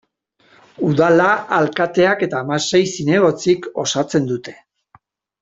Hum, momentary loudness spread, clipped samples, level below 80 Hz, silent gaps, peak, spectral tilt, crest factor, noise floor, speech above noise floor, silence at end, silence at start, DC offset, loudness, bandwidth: none; 7 LU; under 0.1%; -58 dBFS; none; -2 dBFS; -5 dB/octave; 16 dB; -58 dBFS; 41 dB; 0.9 s; 0.8 s; under 0.1%; -17 LUFS; 7.8 kHz